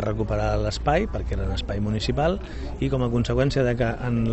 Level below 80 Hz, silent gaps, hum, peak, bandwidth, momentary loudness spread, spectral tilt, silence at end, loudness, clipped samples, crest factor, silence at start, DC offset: -32 dBFS; none; none; -8 dBFS; 8.4 kHz; 6 LU; -7 dB/octave; 0 s; -25 LUFS; under 0.1%; 14 dB; 0 s; under 0.1%